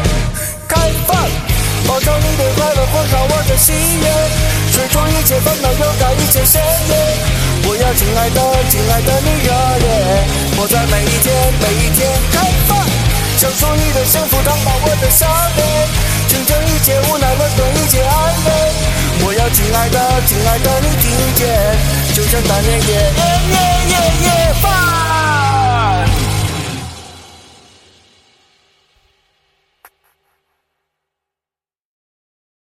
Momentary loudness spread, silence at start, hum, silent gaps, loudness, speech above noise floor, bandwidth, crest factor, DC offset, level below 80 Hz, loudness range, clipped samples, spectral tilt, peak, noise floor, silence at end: 3 LU; 0 s; none; none; -12 LUFS; over 78 dB; 17 kHz; 12 dB; under 0.1%; -20 dBFS; 2 LU; under 0.1%; -4 dB/octave; 0 dBFS; under -90 dBFS; 5.35 s